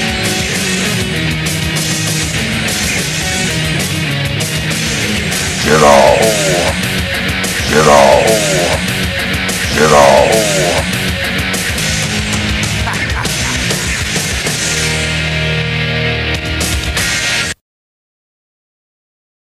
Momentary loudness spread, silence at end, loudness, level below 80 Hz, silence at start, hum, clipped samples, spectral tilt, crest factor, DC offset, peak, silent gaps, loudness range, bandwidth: 8 LU; 2.05 s; -12 LUFS; -28 dBFS; 0 s; none; 0.2%; -3.5 dB/octave; 14 dB; under 0.1%; 0 dBFS; none; 5 LU; 16 kHz